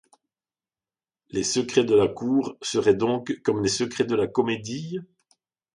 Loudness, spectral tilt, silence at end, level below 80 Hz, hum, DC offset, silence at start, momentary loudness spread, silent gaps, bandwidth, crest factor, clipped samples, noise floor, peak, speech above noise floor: -24 LUFS; -4.5 dB/octave; 0.7 s; -60 dBFS; none; under 0.1%; 1.35 s; 11 LU; none; 11 kHz; 18 dB; under 0.1%; under -90 dBFS; -6 dBFS; over 66 dB